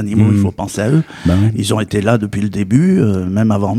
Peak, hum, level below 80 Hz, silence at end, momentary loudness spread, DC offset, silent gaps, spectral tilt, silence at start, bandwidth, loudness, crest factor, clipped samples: 0 dBFS; none; -38 dBFS; 0 s; 6 LU; under 0.1%; none; -7 dB/octave; 0 s; 14 kHz; -14 LUFS; 14 dB; under 0.1%